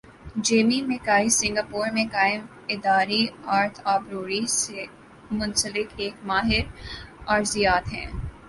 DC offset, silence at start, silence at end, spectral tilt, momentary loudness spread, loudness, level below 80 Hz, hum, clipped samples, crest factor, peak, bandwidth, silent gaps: under 0.1%; 0.1 s; 0 s; -3 dB/octave; 12 LU; -24 LUFS; -44 dBFS; none; under 0.1%; 20 dB; -4 dBFS; 12 kHz; none